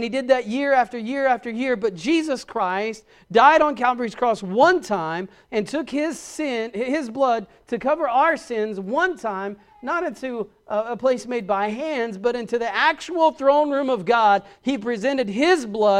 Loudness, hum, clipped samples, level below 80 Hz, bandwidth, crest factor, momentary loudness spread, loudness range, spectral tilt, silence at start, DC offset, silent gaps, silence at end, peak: -22 LUFS; none; under 0.1%; -60 dBFS; 12.5 kHz; 20 dB; 10 LU; 5 LU; -4.5 dB/octave; 0 s; under 0.1%; none; 0 s; -2 dBFS